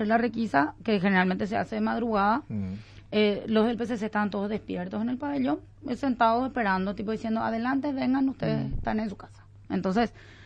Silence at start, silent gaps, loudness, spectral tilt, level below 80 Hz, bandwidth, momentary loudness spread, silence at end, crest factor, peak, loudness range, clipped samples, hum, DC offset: 0 s; none; -28 LUFS; -7.5 dB/octave; -48 dBFS; 8.4 kHz; 9 LU; 0 s; 18 dB; -10 dBFS; 2 LU; under 0.1%; none; under 0.1%